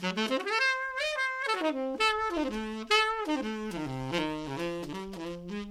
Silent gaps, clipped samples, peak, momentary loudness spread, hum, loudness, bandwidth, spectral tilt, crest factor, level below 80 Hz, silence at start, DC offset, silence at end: none; under 0.1%; -10 dBFS; 11 LU; none; -30 LUFS; 16 kHz; -4 dB/octave; 20 dB; -56 dBFS; 0 s; under 0.1%; 0 s